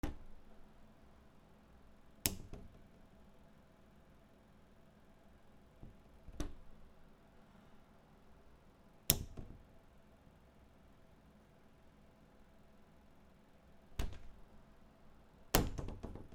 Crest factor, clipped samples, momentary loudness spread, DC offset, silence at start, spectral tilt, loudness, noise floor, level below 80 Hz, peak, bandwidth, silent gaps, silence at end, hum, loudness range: 40 dB; under 0.1%; 26 LU; under 0.1%; 0.05 s; -3.5 dB/octave; -40 LUFS; -64 dBFS; -54 dBFS; -6 dBFS; 16 kHz; none; 0 s; none; 22 LU